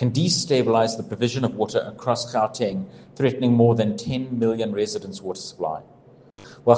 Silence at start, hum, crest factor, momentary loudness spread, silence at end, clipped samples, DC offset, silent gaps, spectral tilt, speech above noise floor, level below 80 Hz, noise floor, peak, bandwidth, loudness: 0 s; none; 20 dB; 12 LU; 0 s; under 0.1%; under 0.1%; none; -5.5 dB/octave; 27 dB; -60 dBFS; -49 dBFS; -2 dBFS; 9.8 kHz; -23 LUFS